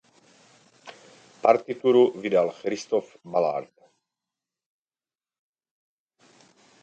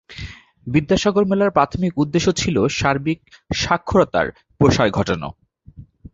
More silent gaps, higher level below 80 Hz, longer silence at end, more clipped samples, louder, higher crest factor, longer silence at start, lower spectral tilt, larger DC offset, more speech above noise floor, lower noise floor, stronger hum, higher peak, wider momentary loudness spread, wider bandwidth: neither; second, -78 dBFS vs -40 dBFS; first, 3.2 s vs 0.3 s; neither; second, -24 LUFS vs -19 LUFS; first, 24 dB vs 18 dB; first, 0.85 s vs 0.1 s; about the same, -5.5 dB/octave vs -5.5 dB/octave; neither; first, over 67 dB vs 25 dB; first, under -90 dBFS vs -43 dBFS; neither; about the same, -4 dBFS vs -2 dBFS; second, 9 LU vs 12 LU; about the same, 8.2 kHz vs 8 kHz